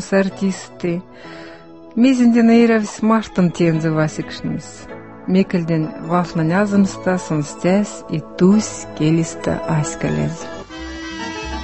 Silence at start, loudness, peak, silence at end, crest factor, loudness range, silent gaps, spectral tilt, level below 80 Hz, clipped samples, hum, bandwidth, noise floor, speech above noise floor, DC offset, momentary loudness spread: 0 s; -18 LUFS; -2 dBFS; 0 s; 16 dB; 4 LU; none; -6.5 dB/octave; -44 dBFS; under 0.1%; none; 8.6 kHz; -39 dBFS; 22 dB; 0.4%; 18 LU